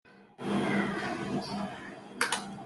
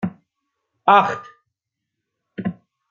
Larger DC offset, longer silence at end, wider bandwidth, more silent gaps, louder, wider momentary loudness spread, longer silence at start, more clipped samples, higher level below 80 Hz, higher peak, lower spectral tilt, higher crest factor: neither; second, 0 s vs 0.4 s; first, 12.5 kHz vs 7.2 kHz; neither; second, -33 LUFS vs -19 LUFS; second, 11 LU vs 17 LU; about the same, 0.05 s vs 0 s; neither; about the same, -68 dBFS vs -68 dBFS; second, -12 dBFS vs -2 dBFS; second, -4.5 dB/octave vs -6.5 dB/octave; about the same, 22 dB vs 22 dB